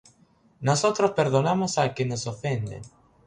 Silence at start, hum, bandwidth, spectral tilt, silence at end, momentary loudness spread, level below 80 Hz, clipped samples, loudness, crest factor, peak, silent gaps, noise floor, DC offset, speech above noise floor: 0.6 s; none; 11 kHz; -5 dB/octave; 0.4 s; 9 LU; -58 dBFS; under 0.1%; -25 LUFS; 18 dB; -8 dBFS; none; -60 dBFS; under 0.1%; 36 dB